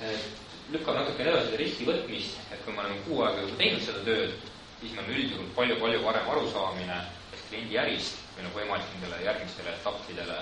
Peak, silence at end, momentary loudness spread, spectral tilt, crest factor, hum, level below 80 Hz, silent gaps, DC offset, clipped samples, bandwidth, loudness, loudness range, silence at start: -8 dBFS; 0 s; 12 LU; -4.5 dB/octave; 22 dB; none; -58 dBFS; none; under 0.1%; under 0.1%; 10.5 kHz; -31 LUFS; 4 LU; 0 s